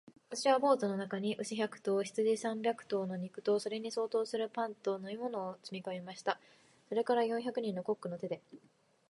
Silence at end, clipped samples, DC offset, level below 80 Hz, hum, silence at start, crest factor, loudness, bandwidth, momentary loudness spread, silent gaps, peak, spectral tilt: 0.5 s; under 0.1%; under 0.1%; -86 dBFS; none; 0.05 s; 20 dB; -36 LUFS; 11.5 kHz; 11 LU; none; -16 dBFS; -5 dB/octave